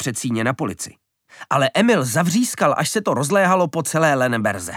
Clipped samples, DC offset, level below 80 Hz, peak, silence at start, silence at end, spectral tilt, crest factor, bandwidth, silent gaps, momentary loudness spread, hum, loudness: under 0.1%; under 0.1%; -62 dBFS; -4 dBFS; 0 s; 0 s; -4.5 dB/octave; 16 dB; 18 kHz; none; 6 LU; none; -19 LUFS